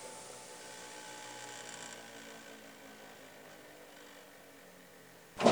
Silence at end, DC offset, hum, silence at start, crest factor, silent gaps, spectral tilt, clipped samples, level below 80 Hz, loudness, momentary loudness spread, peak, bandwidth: 0 s; under 0.1%; none; 0 s; 30 dB; none; -3.5 dB/octave; under 0.1%; -80 dBFS; -46 LUFS; 10 LU; -10 dBFS; over 20 kHz